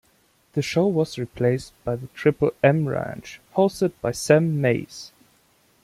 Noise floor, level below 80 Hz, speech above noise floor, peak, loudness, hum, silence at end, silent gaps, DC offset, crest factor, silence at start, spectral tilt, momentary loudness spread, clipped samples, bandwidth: -62 dBFS; -54 dBFS; 40 dB; -2 dBFS; -23 LUFS; none; 0.75 s; none; under 0.1%; 20 dB; 0.55 s; -6.5 dB/octave; 12 LU; under 0.1%; 15 kHz